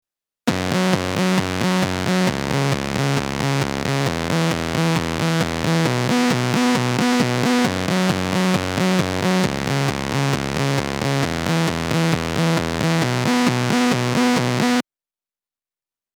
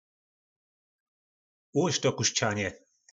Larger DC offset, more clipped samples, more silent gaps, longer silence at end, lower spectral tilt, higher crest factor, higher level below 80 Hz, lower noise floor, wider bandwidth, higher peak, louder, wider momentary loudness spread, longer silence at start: neither; neither; neither; first, 1.35 s vs 0.35 s; first, -5 dB/octave vs -3.5 dB/octave; about the same, 20 dB vs 22 dB; first, -44 dBFS vs -70 dBFS; about the same, under -90 dBFS vs under -90 dBFS; first, over 20 kHz vs 8 kHz; first, 0 dBFS vs -10 dBFS; first, -20 LUFS vs -28 LUFS; second, 3 LU vs 7 LU; second, 0.45 s vs 1.75 s